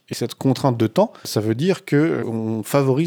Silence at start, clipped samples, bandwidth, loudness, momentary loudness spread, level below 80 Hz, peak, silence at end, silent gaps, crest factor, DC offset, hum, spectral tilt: 0.1 s; under 0.1%; over 20 kHz; -20 LUFS; 5 LU; -68 dBFS; -4 dBFS; 0 s; none; 16 dB; under 0.1%; none; -6.5 dB/octave